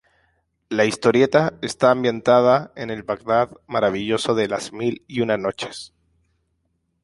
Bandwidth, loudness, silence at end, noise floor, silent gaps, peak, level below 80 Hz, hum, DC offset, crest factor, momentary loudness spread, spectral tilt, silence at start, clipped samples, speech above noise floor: 11.5 kHz; -20 LUFS; 1.15 s; -71 dBFS; none; -2 dBFS; -58 dBFS; none; under 0.1%; 20 dB; 11 LU; -5 dB/octave; 0.7 s; under 0.1%; 51 dB